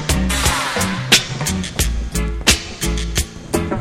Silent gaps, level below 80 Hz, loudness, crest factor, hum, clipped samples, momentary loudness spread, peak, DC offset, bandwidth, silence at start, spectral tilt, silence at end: none; -24 dBFS; -18 LUFS; 18 dB; none; under 0.1%; 9 LU; 0 dBFS; under 0.1%; 17 kHz; 0 s; -3 dB/octave; 0 s